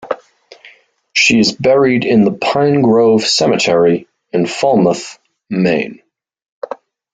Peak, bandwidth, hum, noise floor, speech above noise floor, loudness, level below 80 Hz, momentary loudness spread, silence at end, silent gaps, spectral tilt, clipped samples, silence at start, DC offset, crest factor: 0 dBFS; 9.4 kHz; none; -45 dBFS; 34 dB; -12 LUFS; -54 dBFS; 16 LU; 0.4 s; 6.52-6.62 s; -4.5 dB/octave; under 0.1%; 0 s; under 0.1%; 14 dB